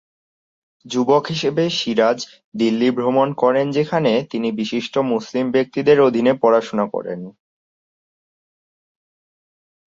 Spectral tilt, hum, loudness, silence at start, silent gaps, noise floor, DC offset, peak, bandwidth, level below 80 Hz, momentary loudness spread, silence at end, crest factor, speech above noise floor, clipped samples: -6 dB/octave; none; -18 LUFS; 0.85 s; 2.44-2.52 s; under -90 dBFS; under 0.1%; -2 dBFS; 7.6 kHz; -64 dBFS; 9 LU; 2.6 s; 18 dB; over 72 dB; under 0.1%